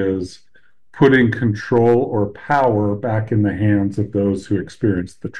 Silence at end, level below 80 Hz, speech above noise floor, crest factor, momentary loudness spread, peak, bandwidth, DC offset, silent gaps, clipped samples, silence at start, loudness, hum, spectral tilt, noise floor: 0 s; -50 dBFS; 37 dB; 16 dB; 8 LU; -2 dBFS; 9.6 kHz; 0.5%; none; under 0.1%; 0 s; -18 LUFS; none; -8 dB/octave; -54 dBFS